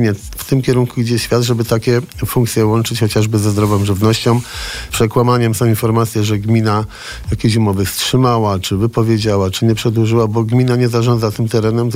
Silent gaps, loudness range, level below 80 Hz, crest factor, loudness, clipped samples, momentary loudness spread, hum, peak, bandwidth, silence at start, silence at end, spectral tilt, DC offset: none; 1 LU; -36 dBFS; 12 dB; -15 LUFS; under 0.1%; 4 LU; none; -2 dBFS; 16 kHz; 0 s; 0 s; -6 dB/octave; under 0.1%